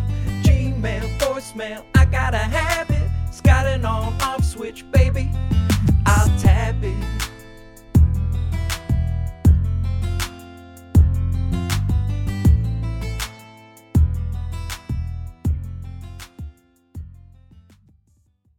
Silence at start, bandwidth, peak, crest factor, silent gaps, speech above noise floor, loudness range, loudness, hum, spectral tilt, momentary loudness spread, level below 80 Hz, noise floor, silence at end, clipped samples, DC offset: 0 s; 16.5 kHz; -2 dBFS; 18 dB; none; 42 dB; 8 LU; -21 LUFS; none; -6 dB/octave; 16 LU; -24 dBFS; -60 dBFS; 1.45 s; under 0.1%; under 0.1%